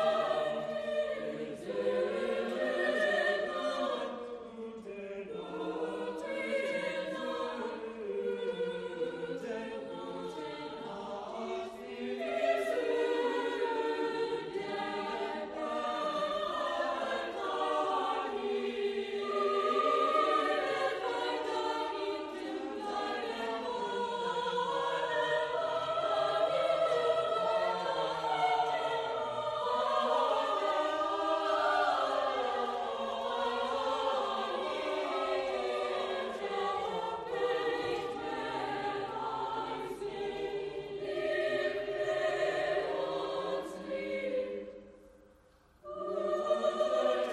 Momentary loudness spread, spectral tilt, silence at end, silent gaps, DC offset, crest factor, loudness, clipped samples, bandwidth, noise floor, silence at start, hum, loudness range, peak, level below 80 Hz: 10 LU; -4 dB/octave; 0 s; none; under 0.1%; 16 dB; -34 LUFS; under 0.1%; 13 kHz; -64 dBFS; 0 s; none; 6 LU; -18 dBFS; -70 dBFS